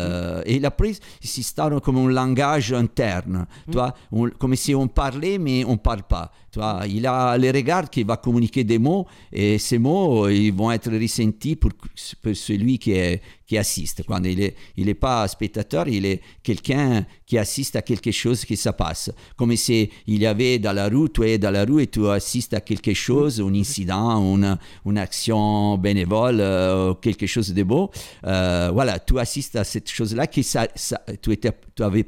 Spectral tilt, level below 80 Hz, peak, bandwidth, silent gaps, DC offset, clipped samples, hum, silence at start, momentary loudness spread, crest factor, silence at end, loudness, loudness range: -5.5 dB/octave; -34 dBFS; -6 dBFS; 16.5 kHz; none; under 0.1%; under 0.1%; none; 0 s; 8 LU; 16 dB; 0 s; -22 LUFS; 3 LU